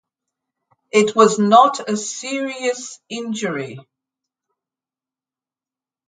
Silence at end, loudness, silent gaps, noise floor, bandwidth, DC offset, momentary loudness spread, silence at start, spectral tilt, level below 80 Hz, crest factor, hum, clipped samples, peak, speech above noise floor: 2.25 s; -17 LUFS; none; under -90 dBFS; 9.6 kHz; under 0.1%; 17 LU; 0.95 s; -4 dB/octave; -72 dBFS; 20 dB; none; under 0.1%; 0 dBFS; over 72 dB